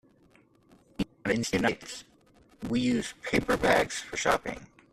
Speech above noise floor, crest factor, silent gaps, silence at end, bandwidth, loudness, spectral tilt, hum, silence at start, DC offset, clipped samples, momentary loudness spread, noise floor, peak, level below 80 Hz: 34 dB; 22 dB; none; 0.3 s; 14 kHz; -29 LUFS; -4 dB/octave; none; 1 s; under 0.1%; under 0.1%; 16 LU; -62 dBFS; -10 dBFS; -52 dBFS